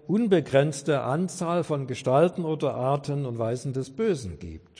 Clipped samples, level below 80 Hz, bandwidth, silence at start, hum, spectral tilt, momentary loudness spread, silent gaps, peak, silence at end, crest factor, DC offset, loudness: under 0.1%; -56 dBFS; 10.5 kHz; 0.05 s; none; -6.5 dB/octave; 8 LU; none; -8 dBFS; 0.2 s; 18 dB; under 0.1%; -26 LUFS